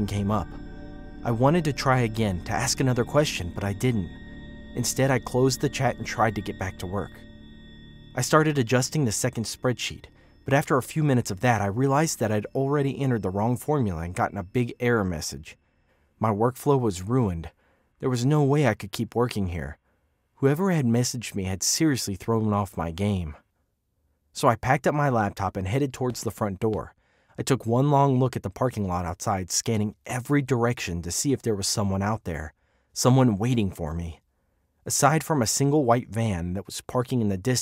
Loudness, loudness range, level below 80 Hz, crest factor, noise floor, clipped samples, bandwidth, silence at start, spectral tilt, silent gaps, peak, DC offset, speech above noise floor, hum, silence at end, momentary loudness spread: -25 LUFS; 2 LU; -48 dBFS; 22 dB; -73 dBFS; under 0.1%; 16 kHz; 0 s; -5 dB/octave; none; -4 dBFS; under 0.1%; 48 dB; none; 0 s; 11 LU